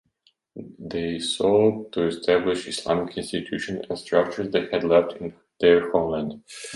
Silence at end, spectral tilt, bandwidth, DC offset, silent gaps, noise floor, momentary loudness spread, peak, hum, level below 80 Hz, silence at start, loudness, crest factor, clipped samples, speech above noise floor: 0 s; -5 dB/octave; 11.5 kHz; under 0.1%; none; -66 dBFS; 14 LU; -4 dBFS; none; -56 dBFS; 0.55 s; -23 LUFS; 20 dB; under 0.1%; 43 dB